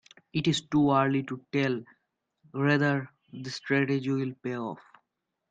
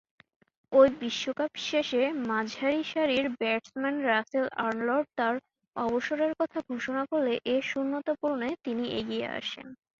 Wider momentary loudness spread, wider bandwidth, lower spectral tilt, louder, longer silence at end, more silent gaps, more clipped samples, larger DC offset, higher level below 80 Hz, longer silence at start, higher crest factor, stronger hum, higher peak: first, 14 LU vs 6 LU; first, 9 kHz vs 7.4 kHz; first, -6 dB/octave vs -4 dB/octave; about the same, -28 LUFS vs -29 LUFS; first, 0.7 s vs 0.25 s; second, none vs 5.68-5.72 s; neither; neither; about the same, -66 dBFS vs -68 dBFS; second, 0.35 s vs 0.7 s; about the same, 20 dB vs 22 dB; neither; about the same, -10 dBFS vs -8 dBFS